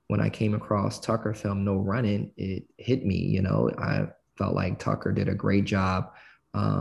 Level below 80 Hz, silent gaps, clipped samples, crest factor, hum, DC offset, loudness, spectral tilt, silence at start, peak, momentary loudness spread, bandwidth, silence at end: -46 dBFS; none; under 0.1%; 16 dB; none; under 0.1%; -28 LUFS; -7.5 dB/octave; 0.1 s; -10 dBFS; 8 LU; 11.5 kHz; 0 s